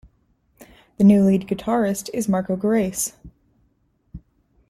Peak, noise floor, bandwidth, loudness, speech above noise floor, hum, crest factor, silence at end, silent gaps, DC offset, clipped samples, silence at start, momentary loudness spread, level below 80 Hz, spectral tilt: -6 dBFS; -65 dBFS; 15 kHz; -20 LUFS; 46 dB; none; 16 dB; 0.5 s; none; under 0.1%; under 0.1%; 1 s; 10 LU; -52 dBFS; -6.5 dB/octave